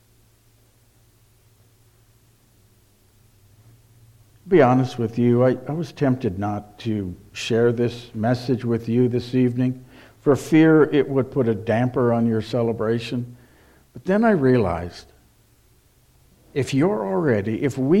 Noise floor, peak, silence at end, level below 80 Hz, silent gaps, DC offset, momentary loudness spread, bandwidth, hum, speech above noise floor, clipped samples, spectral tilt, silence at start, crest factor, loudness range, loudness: -57 dBFS; -4 dBFS; 0 s; -54 dBFS; none; under 0.1%; 12 LU; 13.5 kHz; none; 37 dB; under 0.1%; -7.5 dB/octave; 4.45 s; 18 dB; 5 LU; -21 LUFS